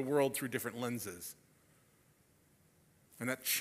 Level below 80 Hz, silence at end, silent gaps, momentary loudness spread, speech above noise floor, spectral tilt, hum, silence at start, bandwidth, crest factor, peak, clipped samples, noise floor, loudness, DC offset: -80 dBFS; 0 s; none; 15 LU; 33 dB; -3.5 dB/octave; none; 0 s; 16 kHz; 20 dB; -20 dBFS; under 0.1%; -70 dBFS; -38 LUFS; under 0.1%